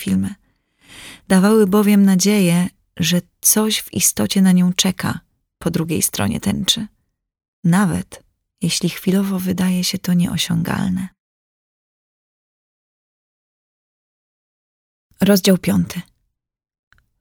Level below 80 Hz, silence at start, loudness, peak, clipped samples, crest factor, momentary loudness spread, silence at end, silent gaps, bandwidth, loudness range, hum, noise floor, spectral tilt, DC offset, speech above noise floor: -50 dBFS; 0 s; -17 LUFS; 0 dBFS; under 0.1%; 18 dB; 12 LU; 1.2 s; 7.48-7.63 s, 11.20-15.10 s; 19 kHz; 8 LU; none; -77 dBFS; -4.5 dB/octave; under 0.1%; 60 dB